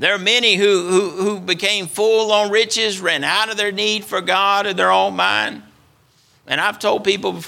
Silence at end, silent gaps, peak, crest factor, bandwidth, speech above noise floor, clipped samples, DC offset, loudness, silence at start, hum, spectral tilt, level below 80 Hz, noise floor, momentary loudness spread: 0 s; none; 0 dBFS; 16 dB; 16.5 kHz; 38 dB; under 0.1%; under 0.1%; -16 LUFS; 0 s; none; -2.5 dB/octave; -66 dBFS; -56 dBFS; 6 LU